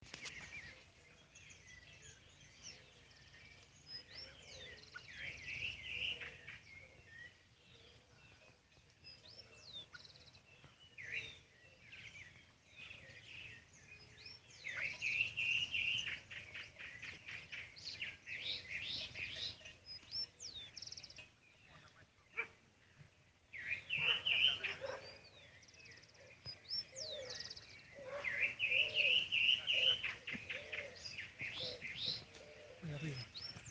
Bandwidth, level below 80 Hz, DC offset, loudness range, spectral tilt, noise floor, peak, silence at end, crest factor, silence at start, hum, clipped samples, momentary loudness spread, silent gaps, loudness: 9.6 kHz; -74 dBFS; under 0.1%; 20 LU; -1.5 dB/octave; -69 dBFS; -20 dBFS; 0 s; 26 dB; 0 s; none; under 0.1%; 26 LU; none; -40 LUFS